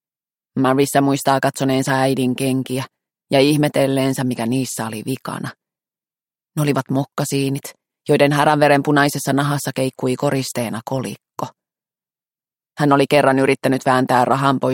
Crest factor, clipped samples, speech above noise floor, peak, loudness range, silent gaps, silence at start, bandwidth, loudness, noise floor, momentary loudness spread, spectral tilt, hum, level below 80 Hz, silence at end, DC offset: 18 dB; under 0.1%; over 73 dB; -2 dBFS; 6 LU; none; 0.55 s; 17 kHz; -18 LUFS; under -90 dBFS; 14 LU; -5.5 dB/octave; none; -60 dBFS; 0 s; under 0.1%